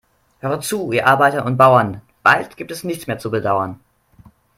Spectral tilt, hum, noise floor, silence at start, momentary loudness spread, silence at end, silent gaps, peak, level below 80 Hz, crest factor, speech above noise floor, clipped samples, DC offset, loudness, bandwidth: -5 dB/octave; none; -49 dBFS; 0.45 s; 15 LU; 0.85 s; none; 0 dBFS; -56 dBFS; 18 dB; 32 dB; under 0.1%; under 0.1%; -17 LUFS; 16.5 kHz